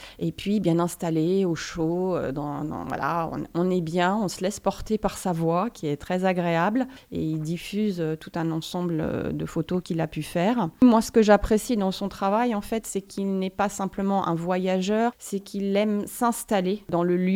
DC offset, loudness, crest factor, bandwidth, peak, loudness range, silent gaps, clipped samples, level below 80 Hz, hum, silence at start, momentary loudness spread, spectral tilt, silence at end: under 0.1%; -25 LUFS; 22 dB; 16.5 kHz; -4 dBFS; 5 LU; none; under 0.1%; -48 dBFS; none; 0 s; 8 LU; -6 dB/octave; 0 s